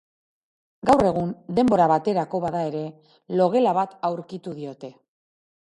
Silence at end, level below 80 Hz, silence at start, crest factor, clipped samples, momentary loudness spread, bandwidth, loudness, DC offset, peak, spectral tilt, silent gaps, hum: 0.75 s; -56 dBFS; 0.85 s; 20 dB; under 0.1%; 16 LU; 11.5 kHz; -22 LUFS; under 0.1%; -4 dBFS; -7.5 dB/octave; none; none